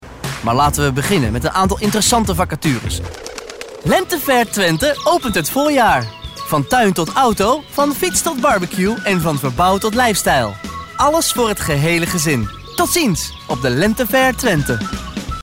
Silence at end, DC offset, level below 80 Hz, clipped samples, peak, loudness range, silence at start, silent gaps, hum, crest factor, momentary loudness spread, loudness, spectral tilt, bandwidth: 0 s; under 0.1%; -34 dBFS; under 0.1%; -4 dBFS; 2 LU; 0 s; none; none; 12 dB; 10 LU; -16 LUFS; -4 dB/octave; 16.5 kHz